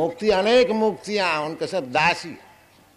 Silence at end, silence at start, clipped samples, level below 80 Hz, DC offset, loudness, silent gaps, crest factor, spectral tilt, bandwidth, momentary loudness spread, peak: 0.55 s; 0 s; under 0.1%; -54 dBFS; under 0.1%; -21 LUFS; none; 16 dB; -4.5 dB/octave; 13 kHz; 10 LU; -6 dBFS